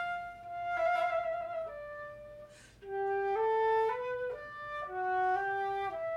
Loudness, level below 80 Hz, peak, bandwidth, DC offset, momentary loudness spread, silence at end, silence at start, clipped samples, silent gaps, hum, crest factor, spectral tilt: -34 LUFS; -66 dBFS; -22 dBFS; 12 kHz; under 0.1%; 16 LU; 0 s; 0 s; under 0.1%; none; none; 12 dB; -5 dB/octave